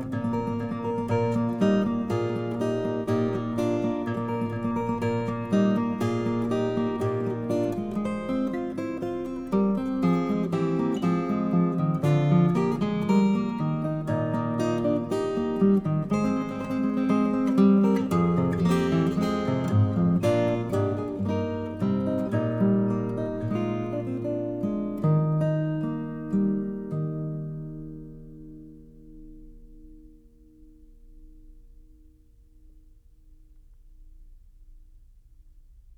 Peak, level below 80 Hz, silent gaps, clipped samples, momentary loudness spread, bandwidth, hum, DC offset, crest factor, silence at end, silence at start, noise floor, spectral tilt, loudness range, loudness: -10 dBFS; -50 dBFS; none; under 0.1%; 8 LU; 12.5 kHz; none; under 0.1%; 16 dB; 0.05 s; 0 s; -55 dBFS; -8.5 dB/octave; 5 LU; -26 LUFS